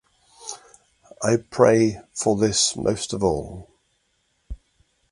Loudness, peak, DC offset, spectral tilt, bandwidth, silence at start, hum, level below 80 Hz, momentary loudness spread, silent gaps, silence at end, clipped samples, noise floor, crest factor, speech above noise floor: -21 LUFS; 0 dBFS; under 0.1%; -4 dB/octave; 11.5 kHz; 0.4 s; none; -46 dBFS; 25 LU; none; 0.55 s; under 0.1%; -69 dBFS; 24 dB; 48 dB